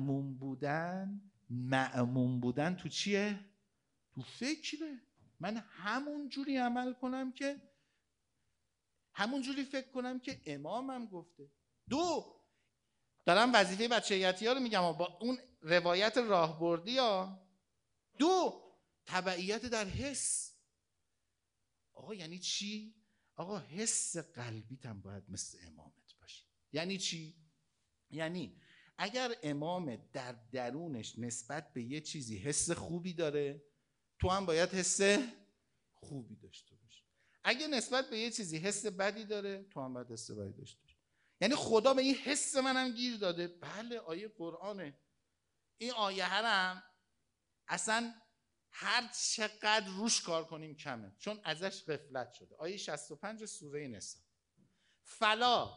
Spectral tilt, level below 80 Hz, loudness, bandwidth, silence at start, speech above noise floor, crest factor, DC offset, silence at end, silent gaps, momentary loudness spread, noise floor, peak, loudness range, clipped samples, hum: -3.5 dB/octave; -66 dBFS; -36 LUFS; 10.5 kHz; 0 s; 49 dB; 26 dB; under 0.1%; 0 s; none; 17 LU; -86 dBFS; -10 dBFS; 9 LU; under 0.1%; none